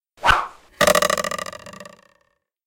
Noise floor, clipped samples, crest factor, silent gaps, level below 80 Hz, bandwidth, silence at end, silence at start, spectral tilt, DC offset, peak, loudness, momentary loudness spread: -68 dBFS; under 0.1%; 22 dB; none; -40 dBFS; 17 kHz; 0.85 s; 0.2 s; -2 dB/octave; under 0.1%; 0 dBFS; -19 LUFS; 22 LU